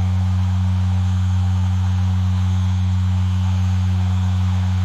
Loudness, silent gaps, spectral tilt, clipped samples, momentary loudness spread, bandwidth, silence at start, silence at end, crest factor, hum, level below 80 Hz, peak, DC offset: -19 LUFS; none; -7.5 dB/octave; under 0.1%; 0 LU; 7.8 kHz; 0 s; 0 s; 6 dB; none; -38 dBFS; -10 dBFS; under 0.1%